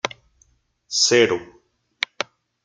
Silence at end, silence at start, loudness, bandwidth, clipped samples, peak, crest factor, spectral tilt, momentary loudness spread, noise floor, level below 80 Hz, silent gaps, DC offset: 0.4 s; 0.05 s; -20 LUFS; 9.6 kHz; under 0.1%; -2 dBFS; 22 dB; -2 dB/octave; 15 LU; -62 dBFS; -64 dBFS; none; under 0.1%